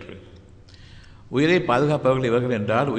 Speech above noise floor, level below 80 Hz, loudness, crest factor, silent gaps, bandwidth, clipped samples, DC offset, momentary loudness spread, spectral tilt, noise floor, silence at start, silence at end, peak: 26 dB; -50 dBFS; -21 LUFS; 18 dB; none; 9.4 kHz; under 0.1%; under 0.1%; 6 LU; -7 dB/octave; -46 dBFS; 0 s; 0 s; -6 dBFS